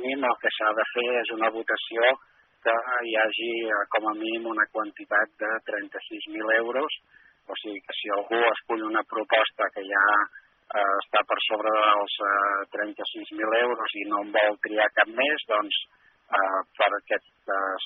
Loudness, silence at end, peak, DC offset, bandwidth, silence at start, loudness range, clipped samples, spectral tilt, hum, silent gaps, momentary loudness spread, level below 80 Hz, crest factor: -25 LUFS; 0 s; -6 dBFS; under 0.1%; 4.2 kHz; 0 s; 4 LU; under 0.1%; 2 dB/octave; none; none; 10 LU; -80 dBFS; 20 dB